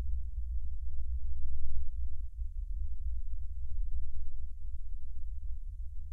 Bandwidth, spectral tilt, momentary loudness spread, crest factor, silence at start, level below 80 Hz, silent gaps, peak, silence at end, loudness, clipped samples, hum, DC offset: 0.2 kHz; -9 dB/octave; 6 LU; 12 dB; 0 s; -36 dBFS; none; -16 dBFS; 0 s; -43 LUFS; under 0.1%; none; under 0.1%